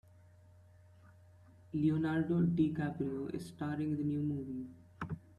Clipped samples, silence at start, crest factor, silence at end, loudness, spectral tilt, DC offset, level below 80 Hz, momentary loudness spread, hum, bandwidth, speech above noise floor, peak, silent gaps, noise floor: under 0.1%; 1.05 s; 16 dB; 0.2 s; -36 LUFS; -9 dB/octave; under 0.1%; -68 dBFS; 13 LU; none; 12 kHz; 26 dB; -20 dBFS; none; -61 dBFS